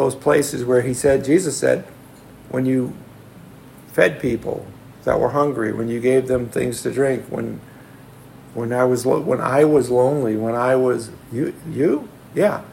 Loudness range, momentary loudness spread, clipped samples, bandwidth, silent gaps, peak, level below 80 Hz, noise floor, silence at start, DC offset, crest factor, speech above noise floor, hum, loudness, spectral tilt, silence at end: 4 LU; 12 LU; under 0.1%; 16.5 kHz; none; -2 dBFS; -50 dBFS; -43 dBFS; 0 s; under 0.1%; 18 dB; 24 dB; none; -20 LUFS; -6 dB/octave; 0 s